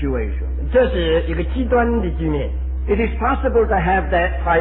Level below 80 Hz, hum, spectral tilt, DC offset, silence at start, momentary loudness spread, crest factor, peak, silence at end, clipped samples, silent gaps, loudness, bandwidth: -22 dBFS; none; -11 dB/octave; under 0.1%; 0 s; 6 LU; 14 dB; -4 dBFS; 0 s; under 0.1%; none; -19 LUFS; 4 kHz